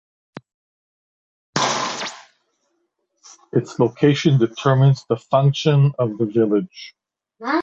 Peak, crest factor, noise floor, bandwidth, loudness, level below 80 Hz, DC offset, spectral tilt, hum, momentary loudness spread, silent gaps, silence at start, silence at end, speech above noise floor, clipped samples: -2 dBFS; 18 dB; -71 dBFS; 7.8 kHz; -19 LUFS; -60 dBFS; under 0.1%; -6 dB/octave; none; 13 LU; none; 1.55 s; 0 s; 54 dB; under 0.1%